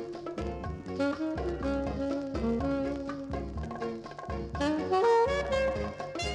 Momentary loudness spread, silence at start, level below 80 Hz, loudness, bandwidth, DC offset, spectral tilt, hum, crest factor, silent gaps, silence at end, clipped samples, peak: 12 LU; 0 s; -44 dBFS; -32 LUFS; 11 kHz; under 0.1%; -6 dB/octave; none; 16 dB; none; 0 s; under 0.1%; -16 dBFS